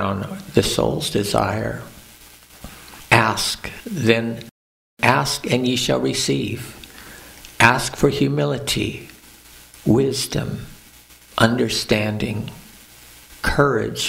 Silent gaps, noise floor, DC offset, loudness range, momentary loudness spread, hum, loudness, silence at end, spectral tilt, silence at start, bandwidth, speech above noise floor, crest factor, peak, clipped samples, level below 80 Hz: 4.51-4.97 s; -47 dBFS; under 0.1%; 3 LU; 22 LU; none; -20 LUFS; 0 s; -4.5 dB/octave; 0 s; 16 kHz; 27 dB; 22 dB; 0 dBFS; under 0.1%; -42 dBFS